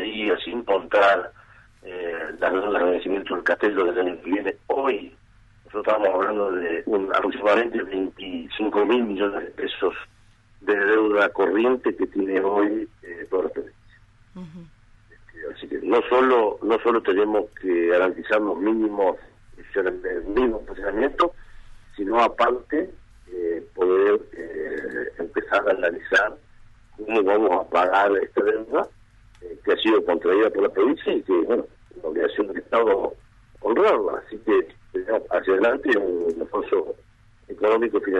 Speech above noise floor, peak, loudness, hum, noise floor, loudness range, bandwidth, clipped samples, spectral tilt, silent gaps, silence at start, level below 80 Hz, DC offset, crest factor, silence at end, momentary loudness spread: 32 dB; -6 dBFS; -22 LUFS; none; -54 dBFS; 3 LU; 8 kHz; under 0.1%; -5.5 dB/octave; none; 0 s; -52 dBFS; under 0.1%; 16 dB; 0 s; 12 LU